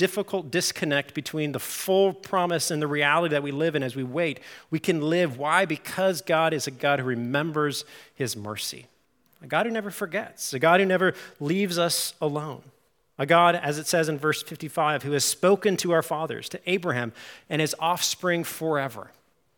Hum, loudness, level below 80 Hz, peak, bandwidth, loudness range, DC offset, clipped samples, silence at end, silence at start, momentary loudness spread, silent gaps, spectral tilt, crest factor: none; -25 LUFS; -74 dBFS; -4 dBFS; 18 kHz; 4 LU; under 0.1%; under 0.1%; 0.55 s; 0 s; 11 LU; none; -4 dB/octave; 22 dB